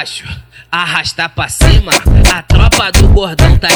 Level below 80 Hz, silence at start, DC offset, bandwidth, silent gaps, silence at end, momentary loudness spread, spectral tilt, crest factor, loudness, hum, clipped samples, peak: -12 dBFS; 0 s; under 0.1%; over 20 kHz; none; 0 s; 12 LU; -4 dB/octave; 8 dB; -10 LUFS; none; 4%; 0 dBFS